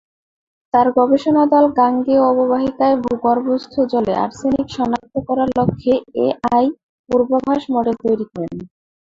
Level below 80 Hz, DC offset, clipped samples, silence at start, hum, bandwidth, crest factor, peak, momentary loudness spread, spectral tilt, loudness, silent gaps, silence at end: -50 dBFS; under 0.1%; under 0.1%; 0.75 s; none; 7.6 kHz; 16 dB; -2 dBFS; 7 LU; -7.5 dB/octave; -17 LUFS; 6.83-7.04 s; 0.45 s